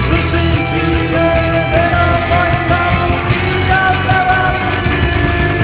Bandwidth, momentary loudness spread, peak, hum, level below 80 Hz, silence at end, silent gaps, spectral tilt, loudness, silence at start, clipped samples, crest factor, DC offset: 4 kHz; 2 LU; 0 dBFS; none; -22 dBFS; 0 s; none; -10 dB/octave; -13 LUFS; 0 s; under 0.1%; 12 dB; under 0.1%